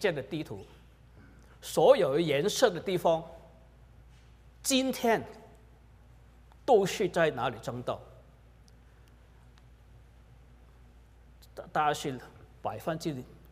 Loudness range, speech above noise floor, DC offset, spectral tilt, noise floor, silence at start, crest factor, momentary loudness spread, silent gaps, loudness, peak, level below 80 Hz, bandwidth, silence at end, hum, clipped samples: 9 LU; 28 dB; under 0.1%; -4.5 dB/octave; -56 dBFS; 0 s; 24 dB; 18 LU; none; -29 LUFS; -8 dBFS; -58 dBFS; 16 kHz; 0.25 s; none; under 0.1%